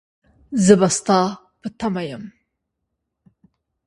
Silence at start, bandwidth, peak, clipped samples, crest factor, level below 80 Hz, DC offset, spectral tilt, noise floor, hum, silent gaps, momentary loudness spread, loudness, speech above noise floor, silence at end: 0.5 s; 11.5 kHz; 0 dBFS; under 0.1%; 22 dB; -56 dBFS; under 0.1%; -5 dB/octave; -78 dBFS; none; none; 21 LU; -18 LUFS; 60 dB; 1.6 s